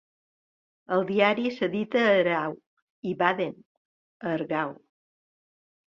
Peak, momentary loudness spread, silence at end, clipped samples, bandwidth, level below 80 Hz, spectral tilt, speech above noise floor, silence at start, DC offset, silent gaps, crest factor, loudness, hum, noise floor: -6 dBFS; 13 LU; 1.2 s; under 0.1%; 7.4 kHz; -74 dBFS; -7 dB/octave; over 65 dB; 0.9 s; under 0.1%; 2.66-3.03 s, 3.66-4.20 s; 22 dB; -26 LUFS; none; under -90 dBFS